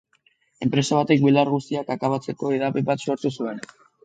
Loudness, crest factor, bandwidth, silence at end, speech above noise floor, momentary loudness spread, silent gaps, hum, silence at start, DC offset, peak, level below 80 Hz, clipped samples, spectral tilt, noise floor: -22 LUFS; 18 dB; 9.2 kHz; 0.4 s; 42 dB; 12 LU; none; none; 0.6 s; under 0.1%; -6 dBFS; -66 dBFS; under 0.1%; -6 dB/octave; -64 dBFS